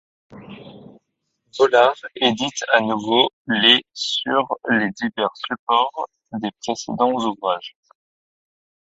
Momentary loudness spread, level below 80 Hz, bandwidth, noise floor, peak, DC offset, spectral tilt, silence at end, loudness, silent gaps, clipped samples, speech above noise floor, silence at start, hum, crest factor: 14 LU; -66 dBFS; 8 kHz; -74 dBFS; 0 dBFS; under 0.1%; -3 dB/octave; 1.15 s; -19 LUFS; 3.33-3.45 s, 5.59-5.67 s; under 0.1%; 54 dB; 0.3 s; none; 22 dB